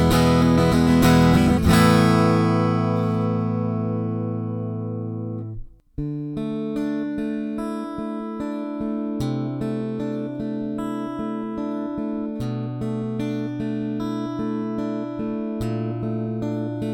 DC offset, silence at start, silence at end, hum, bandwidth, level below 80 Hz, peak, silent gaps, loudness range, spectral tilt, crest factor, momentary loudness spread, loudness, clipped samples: under 0.1%; 0 s; 0 s; none; 19 kHz; -40 dBFS; -4 dBFS; none; 10 LU; -7 dB/octave; 18 dB; 12 LU; -23 LUFS; under 0.1%